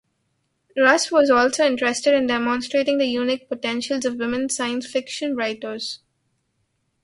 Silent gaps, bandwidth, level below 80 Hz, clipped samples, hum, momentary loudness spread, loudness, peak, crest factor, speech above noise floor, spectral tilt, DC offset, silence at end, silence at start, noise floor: none; 11.5 kHz; -62 dBFS; under 0.1%; none; 11 LU; -21 LUFS; -2 dBFS; 20 dB; 51 dB; -2 dB/octave; under 0.1%; 1.05 s; 0.75 s; -71 dBFS